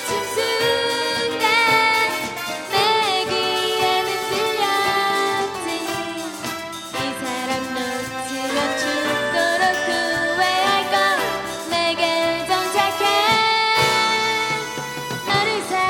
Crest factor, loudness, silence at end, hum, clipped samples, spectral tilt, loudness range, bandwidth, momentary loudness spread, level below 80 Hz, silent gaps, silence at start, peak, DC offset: 18 dB; -19 LUFS; 0 s; none; under 0.1%; -2 dB/octave; 5 LU; 17 kHz; 10 LU; -56 dBFS; none; 0 s; -4 dBFS; under 0.1%